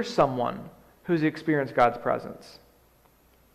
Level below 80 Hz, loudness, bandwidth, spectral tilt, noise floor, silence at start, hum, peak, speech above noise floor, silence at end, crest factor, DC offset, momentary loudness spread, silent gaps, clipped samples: -60 dBFS; -26 LUFS; 14.5 kHz; -6.5 dB/octave; -60 dBFS; 0 s; none; -8 dBFS; 34 dB; 1 s; 20 dB; under 0.1%; 19 LU; none; under 0.1%